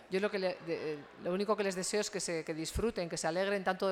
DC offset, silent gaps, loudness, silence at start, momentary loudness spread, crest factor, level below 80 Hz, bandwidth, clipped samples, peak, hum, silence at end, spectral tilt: under 0.1%; none; -35 LUFS; 0 s; 6 LU; 18 dB; -54 dBFS; 16.5 kHz; under 0.1%; -18 dBFS; none; 0 s; -4 dB/octave